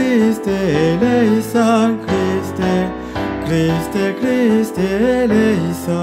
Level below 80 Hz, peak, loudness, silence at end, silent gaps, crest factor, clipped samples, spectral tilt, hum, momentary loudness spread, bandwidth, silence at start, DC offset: -40 dBFS; -2 dBFS; -16 LUFS; 0 s; none; 14 dB; under 0.1%; -6.5 dB/octave; none; 5 LU; 16 kHz; 0 s; under 0.1%